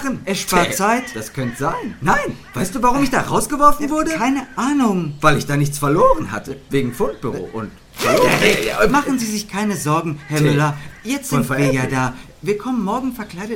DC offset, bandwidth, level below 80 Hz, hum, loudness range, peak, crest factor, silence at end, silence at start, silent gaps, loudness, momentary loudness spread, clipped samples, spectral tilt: under 0.1%; 17 kHz; -36 dBFS; none; 2 LU; 0 dBFS; 18 dB; 0 s; 0 s; none; -18 LUFS; 11 LU; under 0.1%; -5 dB/octave